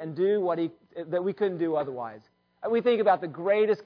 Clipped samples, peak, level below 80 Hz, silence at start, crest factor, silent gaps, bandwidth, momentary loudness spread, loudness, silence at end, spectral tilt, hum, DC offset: under 0.1%; -12 dBFS; -76 dBFS; 0 s; 16 dB; none; 5.4 kHz; 13 LU; -27 LUFS; 0.05 s; -8.5 dB/octave; none; under 0.1%